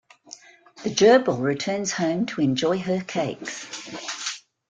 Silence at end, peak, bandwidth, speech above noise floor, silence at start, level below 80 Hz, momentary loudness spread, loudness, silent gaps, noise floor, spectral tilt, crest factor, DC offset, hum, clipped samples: 0.3 s; -4 dBFS; 9.4 kHz; 25 dB; 0.3 s; -64 dBFS; 21 LU; -23 LUFS; none; -47 dBFS; -4.5 dB/octave; 20 dB; under 0.1%; none; under 0.1%